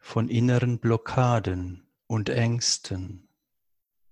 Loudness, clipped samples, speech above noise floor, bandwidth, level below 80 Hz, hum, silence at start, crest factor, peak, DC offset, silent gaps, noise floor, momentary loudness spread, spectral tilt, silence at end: -25 LUFS; under 0.1%; 54 dB; 11 kHz; -48 dBFS; none; 0.05 s; 18 dB; -8 dBFS; under 0.1%; none; -79 dBFS; 12 LU; -5 dB/octave; 0.95 s